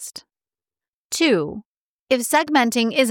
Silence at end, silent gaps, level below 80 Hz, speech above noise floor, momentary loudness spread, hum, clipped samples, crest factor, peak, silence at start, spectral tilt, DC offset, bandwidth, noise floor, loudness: 0 s; 0.88-1.10 s, 1.65-2.07 s; -64 dBFS; over 71 dB; 18 LU; none; under 0.1%; 18 dB; -4 dBFS; 0 s; -3 dB/octave; under 0.1%; 18.5 kHz; under -90 dBFS; -19 LUFS